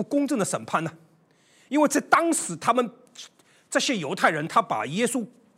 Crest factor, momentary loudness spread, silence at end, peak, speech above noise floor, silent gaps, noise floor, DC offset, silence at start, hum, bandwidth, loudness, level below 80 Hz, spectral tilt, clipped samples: 22 dB; 11 LU; 0.3 s; -4 dBFS; 36 dB; none; -61 dBFS; under 0.1%; 0 s; none; 16 kHz; -24 LUFS; -78 dBFS; -3.5 dB/octave; under 0.1%